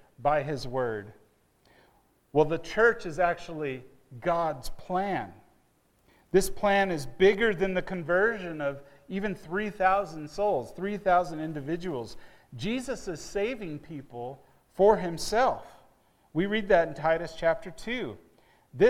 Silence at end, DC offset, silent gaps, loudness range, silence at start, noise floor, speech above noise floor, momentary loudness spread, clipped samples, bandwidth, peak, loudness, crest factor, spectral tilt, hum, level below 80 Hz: 0 s; under 0.1%; none; 5 LU; 0.2 s; -67 dBFS; 39 dB; 15 LU; under 0.1%; 16 kHz; -8 dBFS; -28 LUFS; 20 dB; -5.5 dB/octave; none; -50 dBFS